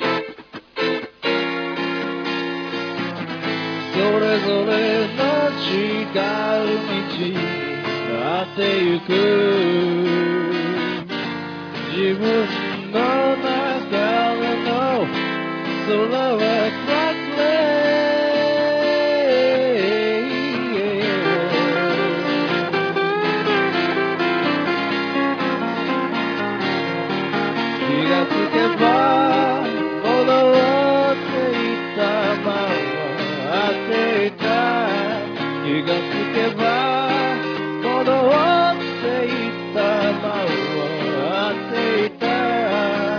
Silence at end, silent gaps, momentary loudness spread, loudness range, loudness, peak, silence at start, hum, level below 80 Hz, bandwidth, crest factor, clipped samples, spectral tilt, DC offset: 0 s; none; 7 LU; 4 LU; -20 LUFS; -2 dBFS; 0 s; none; -66 dBFS; 5.4 kHz; 18 dB; under 0.1%; -6 dB/octave; under 0.1%